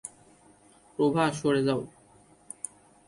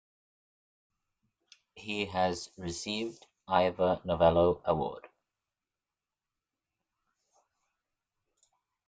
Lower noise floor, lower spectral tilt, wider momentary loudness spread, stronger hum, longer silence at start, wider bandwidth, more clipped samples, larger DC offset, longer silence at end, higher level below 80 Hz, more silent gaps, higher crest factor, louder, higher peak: second, -58 dBFS vs under -90 dBFS; about the same, -5.5 dB/octave vs -5.5 dB/octave; first, 20 LU vs 14 LU; neither; second, 0.05 s vs 1.75 s; first, 11.5 kHz vs 9.4 kHz; neither; neither; second, 1.2 s vs 3.9 s; about the same, -66 dBFS vs -62 dBFS; neither; second, 18 dB vs 24 dB; about the same, -28 LUFS vs -30 LUFS; about the same, -12 dBFS vs -10 dBFS